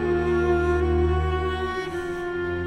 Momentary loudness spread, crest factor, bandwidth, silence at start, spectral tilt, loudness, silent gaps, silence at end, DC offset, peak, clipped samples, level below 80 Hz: 7 LU; 12 dB; 10 kHz; 0 s; -8 dB/octave; -24 LUFS; none; 0 s; under 0.1%; -12 dBFS; under 0.1%; -34 dBFS